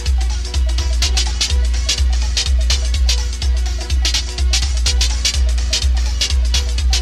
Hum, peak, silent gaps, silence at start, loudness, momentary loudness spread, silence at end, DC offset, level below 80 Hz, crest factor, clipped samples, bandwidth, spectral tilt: none; -2 dBFS; none; 0 s; -17 LUFS; 4 LU; 0 s; under 0.1%; -16 dBFS; 12 dB; under 0.1%; 13 kHz; -2.5 dB/octave